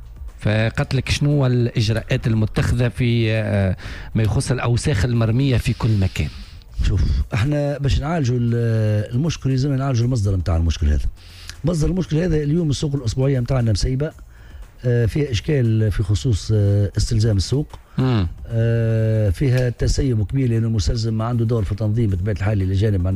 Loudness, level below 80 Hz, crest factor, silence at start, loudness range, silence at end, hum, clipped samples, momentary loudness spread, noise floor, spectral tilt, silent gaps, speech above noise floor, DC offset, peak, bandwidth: -20 LUFS; -30 dBFS; 12 dB; 0 s; 1 LU; 0 s; none; under 0.1%; 4 LU; -39 dBFS; -6.5 dB/octave; none; 20 dB; under 0.1%; -8 dBFS; 12 kHz